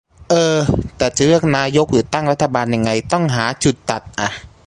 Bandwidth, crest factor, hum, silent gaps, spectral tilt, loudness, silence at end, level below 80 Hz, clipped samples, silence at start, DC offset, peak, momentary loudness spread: 11.5 kHz; 16 dB; none; none; -5 dB/octave; -16 LUFS; 0.2 s; -38 dBFS; under 0.1%; 0.3 s; under 0.1%; 0 dBFS; 8 LU